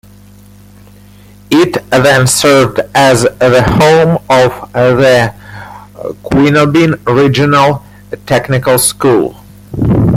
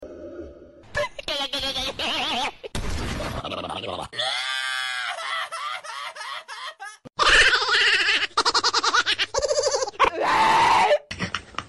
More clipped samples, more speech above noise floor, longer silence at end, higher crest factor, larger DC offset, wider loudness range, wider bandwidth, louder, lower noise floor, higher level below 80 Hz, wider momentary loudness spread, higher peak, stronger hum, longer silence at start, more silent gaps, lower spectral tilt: neither; first, 29 dB vs 16 dB; about the same, 0 s vs 0 s; second, 10 dB vs 18 dB; neither; second, 3 LU vs 9 LU; first, 16 kHz vs 12.5 kHz; first, -9 LUFS vs -22 LUFS; second, -37 dBFS vs -45 dBFS; first, -34 dBFS vs -42 dBFS; about the same, 16 LU vs 16 LU; first, 0 dBFS vs -6 dBFS; first, 50 Hz at -35 dBFS vs none; first, 1.5 s vs 0 s; neither; first, -5 dB/octave vs -1.5 dB/octave